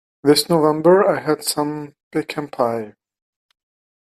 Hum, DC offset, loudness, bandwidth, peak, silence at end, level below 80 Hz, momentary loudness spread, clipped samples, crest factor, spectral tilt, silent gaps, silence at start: none; under 0.1%; -18 LUFS; 15 kHz; -2 dBFS; 1.2 s; -62 dBFS; 14 LU; under 0.1%; 18 dB; -4.5 dB/octave; 2.03-2.11 s; 0.25 s